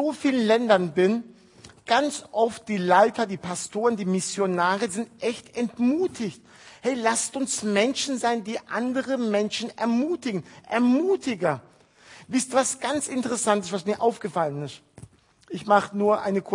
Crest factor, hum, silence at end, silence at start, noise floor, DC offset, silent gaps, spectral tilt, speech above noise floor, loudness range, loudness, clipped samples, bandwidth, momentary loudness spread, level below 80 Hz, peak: 20 dB; none; 0 s; 0 s; -51 dBFS; under 0.1%; none; -4 dB/octave; 27 dB; 3 LU; -25 LUFS; under 0.1%; 11 kHz; 9 LU; -70 dBFS; -4 dBFS